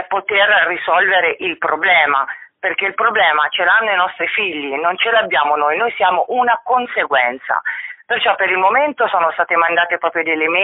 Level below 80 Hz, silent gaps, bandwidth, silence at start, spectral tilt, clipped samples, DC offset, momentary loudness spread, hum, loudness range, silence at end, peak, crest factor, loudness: -62 dBFS; none; 4.1 kHz; 0 s; 1.5 dB/octave; under 0.1%; under 0.1%; 7 LU; none; 2 LU; 0 s; 0 dBFS; 14 dB; -15 LUFS